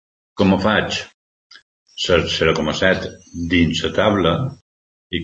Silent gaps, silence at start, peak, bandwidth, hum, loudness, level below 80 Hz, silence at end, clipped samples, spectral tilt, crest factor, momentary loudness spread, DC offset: 1.14-1.50 s, 1.62-1.86 s, 4.62-5.10 s; 0.35 s; -2 dBFS; 8.4 kHz; none; -18 LUFS; -42 dBFS; 0 s; under 0.1%; -5 dB/octave; 18 dB; 13 LU; under 0.1%